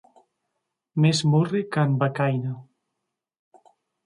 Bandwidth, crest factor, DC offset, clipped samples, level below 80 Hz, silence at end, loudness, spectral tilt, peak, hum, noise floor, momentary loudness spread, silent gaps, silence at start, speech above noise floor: 11 kHz; 18 dB; under 0.1%; under 0.1%; -68 dBFS; 1.45 s; -23 LUFS; -6.5 dB/octave; -8 dBFS; none; -83 dBFS; 12 LU; none; 0.95 s; 61 dB